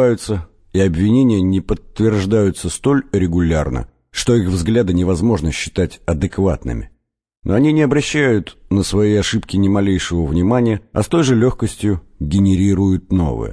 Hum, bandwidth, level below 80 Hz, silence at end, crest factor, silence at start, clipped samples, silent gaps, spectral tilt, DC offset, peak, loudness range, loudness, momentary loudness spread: none; 11 kHz; -32 dBFS; 0 s; 14 dB; 0 s; under 0.1%; none; -6.5 dB/octave; under 0.1%; -2 dBFS; 2 LU; -17 LUFS; 7 LU